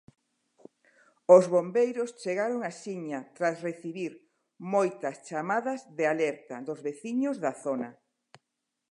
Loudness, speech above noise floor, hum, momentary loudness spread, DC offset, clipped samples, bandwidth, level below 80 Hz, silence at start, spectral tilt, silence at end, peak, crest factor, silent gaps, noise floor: -29 LUFS; 56 dB; none; 16 LU; under 0.1%; under 0.1%; 11 kHz; -86 dBFS; 1.3 s; -6 dB/octave; 1 s; -6 dBFS; 24 dB; none; -84 dBFS